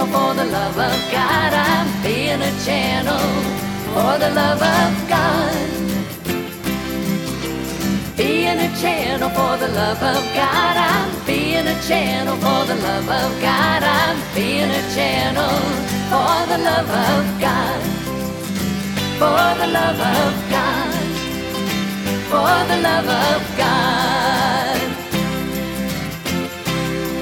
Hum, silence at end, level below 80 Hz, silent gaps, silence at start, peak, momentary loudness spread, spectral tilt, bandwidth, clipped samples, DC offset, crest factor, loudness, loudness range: none; 0 s; -40 dBFS; none; 0 s; -2 dBFS; 7 LU; -4.5 dB/octave; 19 kHz; under 0.1%; under 0.1%; 16 dB; -18 LUFS; 2 LU